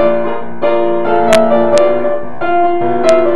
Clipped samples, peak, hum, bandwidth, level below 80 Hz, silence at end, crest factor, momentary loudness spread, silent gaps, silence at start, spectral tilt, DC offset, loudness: under 0.1%; 0 dBFS; none; 12 kHz; -48 dBFS; 0 s; 12 dB; 8 LU; none; 0 s; -5 dB/octave; 20%; -12 LUFS